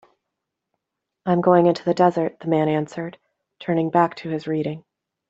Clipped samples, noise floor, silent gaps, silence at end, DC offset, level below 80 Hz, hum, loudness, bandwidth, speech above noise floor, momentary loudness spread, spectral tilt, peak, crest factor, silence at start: under 0.1%; -82 dBFS; none; 0.5 s; under 0.1%; -66 dBFS; none; -21 LUFS; 7.8 kHz; 62 dB; 15 LU; -8 dB/octave; -4 dBFS; 20 dB; 1.25 s